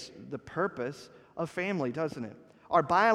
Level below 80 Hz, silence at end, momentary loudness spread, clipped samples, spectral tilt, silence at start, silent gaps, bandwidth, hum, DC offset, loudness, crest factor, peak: -68 dBFS; 0 s; 16 LU; under 0.1%; -6 dB/octave; 0 s; none; 12.5 kHz; none; under 0.1%; -32 LUFS; 22 dB; -10 dBFS